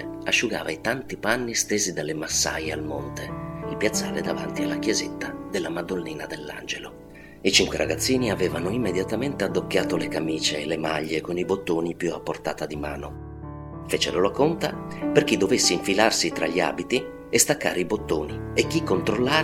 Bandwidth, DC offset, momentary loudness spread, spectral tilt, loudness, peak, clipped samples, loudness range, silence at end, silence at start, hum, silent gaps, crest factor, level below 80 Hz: 17 kHz; under 0.1%; 13 LU; -3.5 dB/octave; -25 LUFS; -2 dBFS; under 0.1%; 6 LU; 0 s; 0 s; none; none; 24 dB; -48 dBFS